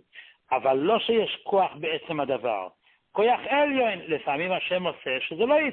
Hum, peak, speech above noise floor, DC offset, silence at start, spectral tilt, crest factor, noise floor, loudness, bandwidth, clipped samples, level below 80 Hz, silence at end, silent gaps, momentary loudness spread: none; -10 dBFS; 26 dB; under 0.1%; 0.15 s; -9 dB/octave; 16 dB; -51 dBFS; -25 LUFS; 4.3 kHz; under 0.1%; -68 dBFS; 0 s; none; 7 LU